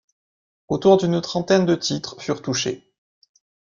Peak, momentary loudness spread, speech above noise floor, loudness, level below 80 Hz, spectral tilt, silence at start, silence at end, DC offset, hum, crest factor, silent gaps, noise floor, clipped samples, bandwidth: -2 dBFS; 11 LU; over 70 dB; -21 LUFS; -58 dBFS; -5 dB/octave; 0.7 s; 1 s; under 0.1%; none; 20 dB; none; under -90 dBFS; under 0.1%; 7.4 kHz